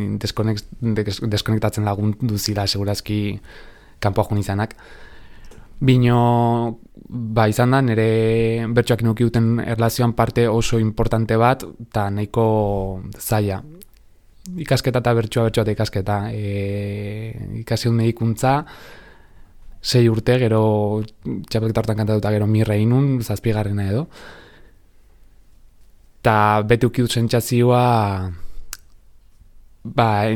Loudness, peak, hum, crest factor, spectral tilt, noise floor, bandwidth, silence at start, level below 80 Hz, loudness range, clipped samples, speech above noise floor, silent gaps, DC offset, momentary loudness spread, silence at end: -19 LUFS; -2 dBFS; none; 18 dB; -6.5 dB/octave; -49 dBFS; 18 kHz; 0 s; -40 dBFS; 5 LU; under 0.1%; 30 dB; none; under 0.1%; 12 LU; 0 s